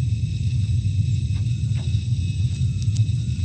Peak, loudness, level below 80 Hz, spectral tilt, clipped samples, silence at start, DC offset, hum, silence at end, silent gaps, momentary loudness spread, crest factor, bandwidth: -10 dBFS; -23 LUFS; -32 dBFS; -6.5 dB/octave; under 0.1%; 0 s; under 0.1%; none; 0 s; none; 2 LU; 12 dB; 8.8 kHz